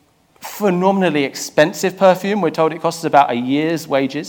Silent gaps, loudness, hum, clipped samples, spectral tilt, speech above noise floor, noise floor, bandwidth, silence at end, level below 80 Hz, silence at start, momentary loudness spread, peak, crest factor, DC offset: none; -16 LUFS; none; under 0.1%; -5 dB/octave; 22 dB; -37 dBFS; 19 kHz; 0 s; -66 dBFS; 0.4 s; 6 LU; 0 dBFS; 16 dB; under 0.1%